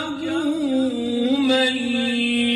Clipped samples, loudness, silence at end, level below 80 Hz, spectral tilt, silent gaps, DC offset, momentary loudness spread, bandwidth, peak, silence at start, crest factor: under 0.1%; -21 LUFS; 0 s; -58 dBFS; -3.5 dB/octave; none; under 0.1%; 5 LU; 12 kHz; -8 dBFS; 0 s; 12 dB